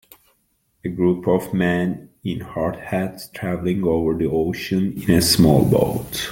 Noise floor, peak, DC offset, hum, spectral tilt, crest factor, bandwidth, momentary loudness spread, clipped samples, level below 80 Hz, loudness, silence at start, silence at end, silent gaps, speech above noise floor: -66 dBFS; -2 dBFS; under 0.1%; none; -5.5 dB/octave; 18 dB; 17 kHz; 14 LU; under 0.1%; -44 dBFS; -20 LUFS; 0.85 s; 0 s; none; 47 dB